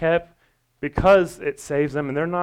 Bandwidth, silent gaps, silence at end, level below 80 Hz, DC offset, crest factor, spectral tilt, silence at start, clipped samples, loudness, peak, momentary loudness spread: 14 kHz; none; 0 s; -42 dBFS; under 0.1%; 16 dB; -6.5 dB/octave; 0 s; under 0.1%; -21 LUFS; -6 dBFS; 13 LU